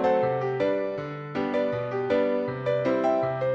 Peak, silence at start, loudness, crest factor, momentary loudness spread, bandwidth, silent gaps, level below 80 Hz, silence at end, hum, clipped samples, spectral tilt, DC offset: -12 dBFS; 0 s; -26 LUFS; 14 dB; 6 LU; 7.2 kHz; none; -62 dBFS; 0 s; none; under 0.1%; -8 dB/octave; under 0.1%